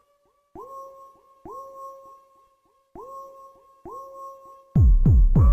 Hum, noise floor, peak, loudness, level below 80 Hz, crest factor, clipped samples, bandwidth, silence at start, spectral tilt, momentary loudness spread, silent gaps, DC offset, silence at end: none; -67 dBFS; -8 dBFS; -19 LUFS; -26 dBFS; 14 dB; under 0.1%; 1.8 kHz; 0.6 s; -11.5 dB/octave; 26 LU; none; under 0.1%; 0 s